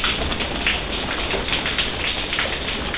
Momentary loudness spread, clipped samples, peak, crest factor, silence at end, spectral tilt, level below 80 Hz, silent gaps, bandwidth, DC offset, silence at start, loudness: 3 LU; under 0.1%; -6 dBFS; 18 dB; 0 s; -8 dB/octave; -34 dBFS; none; 4 kHz; 0.7%; 0 s; -22 LUFS